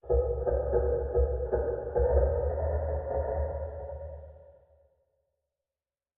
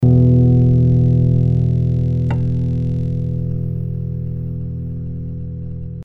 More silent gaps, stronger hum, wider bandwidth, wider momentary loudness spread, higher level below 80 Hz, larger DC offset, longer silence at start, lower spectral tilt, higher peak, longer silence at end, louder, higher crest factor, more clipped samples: neither; neither; second, 2.1 kHz vs 2.9 kHz; about the same, 13 LU vs 15 LU; second, -36 dBFS vs -30 dBFS; neither; about the same, 0.05 s vs 0 s; about the same, -12 dB/octave vs -12 dB/octave; second, -12 dBFS vs -2 dBFS; first, 1.65 s vs 0 s; second, -30 LUFS vs -17 LUFS; about the same, 18 dB vs 14 dB; neither